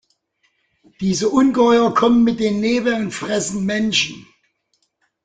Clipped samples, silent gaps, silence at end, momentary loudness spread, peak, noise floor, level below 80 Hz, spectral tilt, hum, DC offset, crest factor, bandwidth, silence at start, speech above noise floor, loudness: under 0.1%; none; 1.05 s; 8 LU; -2 dBFS; -68 dBFS; -54 dBFS; -4.5 dB/octave; none; under 0.1%; 16 dB; 9.4 kHz; 1 s; 51 dB; -17 LUFS